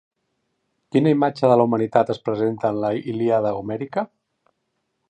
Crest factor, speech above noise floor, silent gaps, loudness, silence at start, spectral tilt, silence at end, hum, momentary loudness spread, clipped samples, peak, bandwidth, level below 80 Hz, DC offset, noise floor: 20 dB; 54 dB; none; -21 LUFS; 0.95 s; -8.5 dB/octave; 1.05 s; none; 10 LU; under 0.1%; -2 dBFS; 9.4 kHz; -62 dBFS; under 0.1%; -74 dBFS